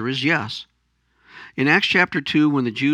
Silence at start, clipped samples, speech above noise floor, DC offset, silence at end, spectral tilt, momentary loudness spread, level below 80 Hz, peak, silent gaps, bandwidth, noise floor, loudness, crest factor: 0 s; under 0.1%; 47 dB; under 0.1%; 0 s; -5.5 dB/octave; 15 LU; -64 dBFS; -2 dBFS; none; 9.8 kHz; -66 dBFS; -18 LUFS; 20 dB